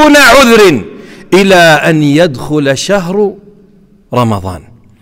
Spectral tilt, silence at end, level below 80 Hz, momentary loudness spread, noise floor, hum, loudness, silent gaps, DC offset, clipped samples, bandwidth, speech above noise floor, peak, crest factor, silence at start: -4.5 dB/octave; 0.45 s; -34 dBFS; 14 LU; -42 dBFS; none; -7 LUFS; none; under 0.1%; 0.4%; 16.5 kHz; 36 dB; 0 dBFS; 8 dB; 0 s